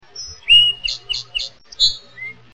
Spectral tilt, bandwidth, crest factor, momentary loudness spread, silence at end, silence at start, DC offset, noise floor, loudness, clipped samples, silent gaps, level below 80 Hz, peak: 1.5 dB/octave; 8.8 kHz; 18 dB; 22 LU; 0.25 s; 0.15 s; under 0.1%; -36 dBFS; -15 LUFS; under 0.1%; none; -44 dBFS; -2 dBFS